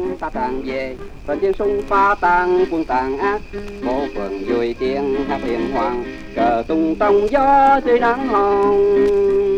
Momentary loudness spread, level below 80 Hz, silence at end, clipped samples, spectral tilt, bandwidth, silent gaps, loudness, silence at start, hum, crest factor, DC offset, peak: 11 LU; -36 dBFS; 0 s; under 0.1%; -6.5 dB/octave; 8.2 kHz; none; -18 LUFS; 0 s; none; 14 dB; under 0.1%; -2 dBFS